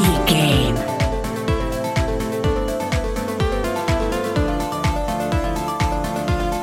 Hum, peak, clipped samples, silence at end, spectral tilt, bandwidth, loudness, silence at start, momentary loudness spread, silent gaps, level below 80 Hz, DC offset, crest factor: none; -2 dBFS; under 0.1%; 0 s; -5.5 dB/octave; 17 kHz; -21 LUFS; 0 s; 6 LU; none; -26 dBFS; under 0.1%; 18 dB